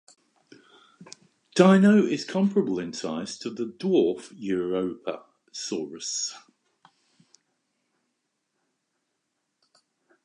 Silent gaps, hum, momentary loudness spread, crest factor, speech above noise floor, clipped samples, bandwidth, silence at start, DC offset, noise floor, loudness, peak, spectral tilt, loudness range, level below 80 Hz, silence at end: none; none; 16 LU; 24 dB; 55 dB; under 0.1%; 10.5 kHz; 1 s; under 0.1%; -79 dBFS; -25 LUFS; -4 dBFS; -5.5 dB/octave; 13 LU; -72 dBFS; 3.85 s